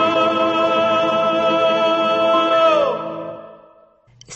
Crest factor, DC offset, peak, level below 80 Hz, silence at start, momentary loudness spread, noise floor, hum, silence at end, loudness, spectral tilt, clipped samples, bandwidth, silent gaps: 12 dB; under 0.1%; -4 dBFS; -60 dBFS; 0 s; 13 LU; -51 dBFS; none; 0 s; -16 LUFS; -4.5 dB/octave; under 0.1%; 8.4 kHz; none